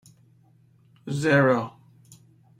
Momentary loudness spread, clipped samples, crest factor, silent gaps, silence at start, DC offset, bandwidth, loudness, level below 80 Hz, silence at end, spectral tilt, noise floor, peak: 19 LU; under 0.1%; 20 dB; none; 1.05 s; under 0.1%; 12.5 kHz; -22 LUFS; -64 dBFS; 0.9 s; -6.5 dB/octave; -59 dBFS; -6 dBFS